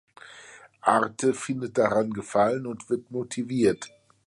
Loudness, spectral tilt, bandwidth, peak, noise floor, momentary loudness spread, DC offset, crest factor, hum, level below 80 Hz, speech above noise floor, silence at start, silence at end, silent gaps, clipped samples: -26 LUFS; -5.5 dB/octave; 11.5 kHz; -6 dBFS; -49 dBFS; 15 LU; under 0.1%; 22 dB; none; -64 dBFS; 24 dB; 0.25 s; 0.4 s; none; under 0.1%